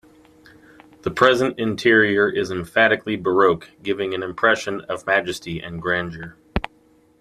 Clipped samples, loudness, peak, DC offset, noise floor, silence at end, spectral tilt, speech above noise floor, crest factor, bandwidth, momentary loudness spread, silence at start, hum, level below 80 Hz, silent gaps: under 0.1%; -20 LUFS; -2 dBFS; under 0.1%; -56 dBFS; 0.6 s; -5 dB/octave; 36 dB; 20 dB; 14 kHz; 13 LU; 1.05 s; none; -44 dBFS; none